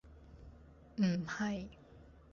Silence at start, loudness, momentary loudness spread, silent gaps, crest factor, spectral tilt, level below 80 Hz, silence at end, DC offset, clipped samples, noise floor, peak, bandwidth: 0.05 s; -37 LUFS; 25 LU; none; 18 dB; -6 dB/octave; -60 dBFS; 0.15 s; under 0.1%; under 0.1%; -59 dBFS; -22 dBFS; 7.2 kHz